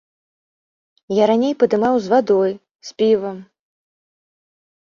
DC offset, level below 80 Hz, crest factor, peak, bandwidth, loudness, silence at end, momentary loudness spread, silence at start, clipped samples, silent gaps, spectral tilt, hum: under 0.1%; -64 dBFS; 18 dB; -2 dBFS; 7.4 kHz; -17 LUFS; 1.4 s; 16 LU; 1.1 s; under 0.1%; 2.71-2.79 s; -6 dB/octave; none